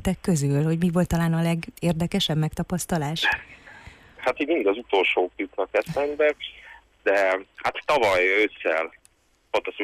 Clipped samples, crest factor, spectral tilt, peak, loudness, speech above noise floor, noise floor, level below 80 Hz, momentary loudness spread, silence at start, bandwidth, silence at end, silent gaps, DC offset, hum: under 0.1%; 14 dB; -5.5 dB/octave; -10 dBFS; -24 LUFS; 38 dB; -61 dBFS; -48 dBFS; 8 LU; 0 s; 15.5 kHz; 0 s; none; under 0.1%; none